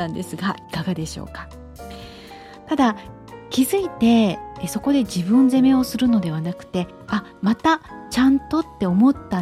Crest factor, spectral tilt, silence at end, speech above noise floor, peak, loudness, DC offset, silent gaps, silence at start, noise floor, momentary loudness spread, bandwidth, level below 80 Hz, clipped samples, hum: 14 dB; -6 dB/octave; 0 s; 21 dB; -6 dBFS; -20 LUFS; under 0.1%; none; 0 s; -40 dBFS; 21 LU; 14.5 kHz; -46 dBFS; under 0.1%; none